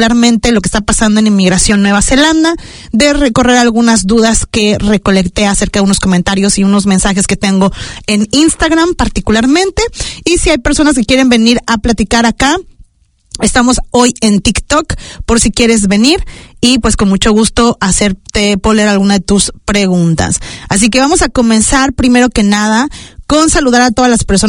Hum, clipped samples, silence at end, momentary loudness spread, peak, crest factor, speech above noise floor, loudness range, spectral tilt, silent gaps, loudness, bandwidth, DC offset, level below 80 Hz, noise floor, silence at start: none; 0.5%; 0 s; 5 LU; 0 dBFS; 10 dB; 39 dB; 2 LU; -4 dB/octave; none; -9 LUFS; 11 kHz; under 0.1%; -24 dBFS; -48 dBFS; 0 s